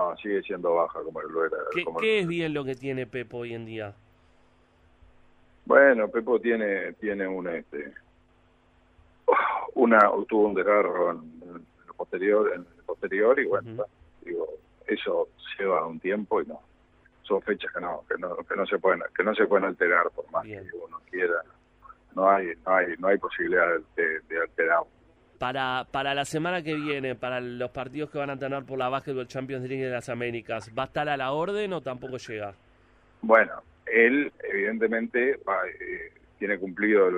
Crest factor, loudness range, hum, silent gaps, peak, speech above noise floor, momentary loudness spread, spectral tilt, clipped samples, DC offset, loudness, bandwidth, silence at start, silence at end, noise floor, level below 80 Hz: 22 dB; 7 LU; none; none; -4 dBFS; 35 dB; 15 LU; -6 dB/octave; under 0.1%; under 0.1%; -26 LUFS; 11 kHz; 0 s; 0 s; -62 dBFS; -64 dBFS